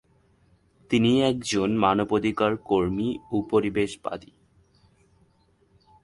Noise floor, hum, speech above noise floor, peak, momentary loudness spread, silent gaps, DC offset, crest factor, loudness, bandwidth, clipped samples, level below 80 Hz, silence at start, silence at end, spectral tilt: -63 dBFS; none; 40 dB; -6 dBFS; 8 LU; none; under 0.1%; 20 dB; -24 LUFS; 11.5 kHz; under 0.1%; -54 dBFS; 0.9 s; 1.85 s; -5.5 dB/octave